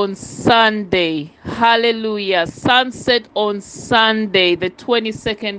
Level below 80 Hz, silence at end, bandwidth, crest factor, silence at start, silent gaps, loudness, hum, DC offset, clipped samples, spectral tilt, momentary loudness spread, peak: -50 dBFS; 0 s; 9.6 kHz; 16 dB; 0 s; none; -16 LUFS; none; under 0.1%; under 0.1%; -4 dB/octave; 9 LU; 0 dBFS